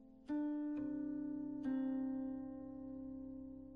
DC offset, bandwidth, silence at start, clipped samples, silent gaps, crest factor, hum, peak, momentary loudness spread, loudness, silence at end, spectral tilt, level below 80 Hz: under 0.1%; 3.7 kHz; 0 s; under 0.1%; none; 12 dB; none; -32 dBFS; 10 LU; -44 LUFS; 0 s; -8 dB/octave; -70 dBFS